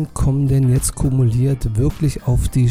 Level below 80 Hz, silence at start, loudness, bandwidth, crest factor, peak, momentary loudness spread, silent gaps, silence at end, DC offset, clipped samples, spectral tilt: -26 dBFS; 0 s; -17 LUFS; 16 kHz; 10 dB; -6 dBFS; 4 LU; none; 0 s; under 0.1%; under 0.1%; -7 dB/octave